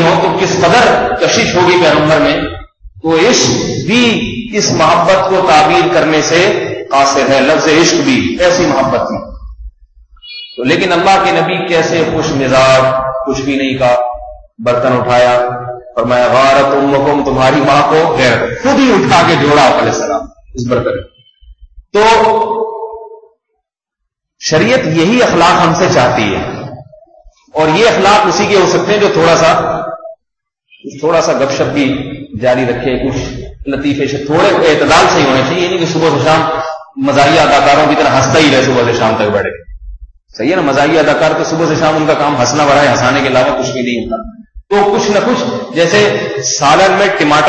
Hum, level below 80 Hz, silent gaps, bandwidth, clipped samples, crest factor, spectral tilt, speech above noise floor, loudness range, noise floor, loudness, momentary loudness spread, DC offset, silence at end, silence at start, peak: none; -36 dBFS; none; 8.8 kHz; under 0.1%; 10 dB; -4.5 dB/octave; 65 dB; 4 LU; -74 dBFS; -10 LUFS; 11 LU; under 0.1%; 0 s; 0 s; 0 dBFS